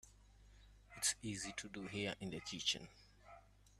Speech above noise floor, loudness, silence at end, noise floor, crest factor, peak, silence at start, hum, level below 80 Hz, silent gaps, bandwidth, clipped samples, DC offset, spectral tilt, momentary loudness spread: 19 dB; -42 LUFS; 0 s; -65 dBFS; 22 dB; -24 dBFS; 0.05 s; 50 Hz at -60 dBFS; -68 dBFS; none; 13.5 kHz; under 0.1%; under 0.1%; -2 dB/octave; 23 LU